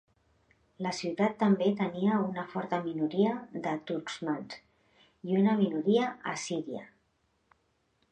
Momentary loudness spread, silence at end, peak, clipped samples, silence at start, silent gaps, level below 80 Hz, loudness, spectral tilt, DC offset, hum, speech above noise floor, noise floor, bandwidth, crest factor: 11 LU; 1.25 s; -14 dBFS; under 0.1%; 0.8 s; none; -76 dBFS; -31 LUFS; -6 dB/octave; under 0.1%; none; 44 dB; -74 dBFS; 9.4 kHz; 18 dB